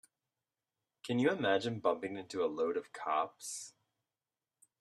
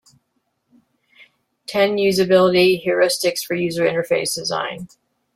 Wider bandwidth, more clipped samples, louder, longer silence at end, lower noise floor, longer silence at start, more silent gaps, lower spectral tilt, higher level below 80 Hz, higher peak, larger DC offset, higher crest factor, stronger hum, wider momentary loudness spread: second, 13 kHz vs 16 kHz; neither; second, -36 LUFS vs -18 LUFS; first, 1.1 s vs 0.5 s; first, under -90 dBFS vs -71 dBFS; second, 1.05 s vs 1.7 s; neither; about the same, -4.5 dB/octave vs -4 dB/octave; second, -82 dBFS vs -62 dBFS; second, -18 dBFS vs -4 dBFS; neither; about the same, 20 dB vs 16 dB; neither; about the same, 12 LU vs 11 LU